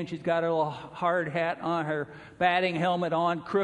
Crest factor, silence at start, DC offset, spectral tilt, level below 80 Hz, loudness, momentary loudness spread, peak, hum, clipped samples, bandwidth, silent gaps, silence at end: 18 dB; 0 s; under 0.1%; -6.5 dB/octave; -66 dBFS; -28 LUFS; 7 LU; -10 dBFS; none; under 0.1%; 10 kHz; none; 0 s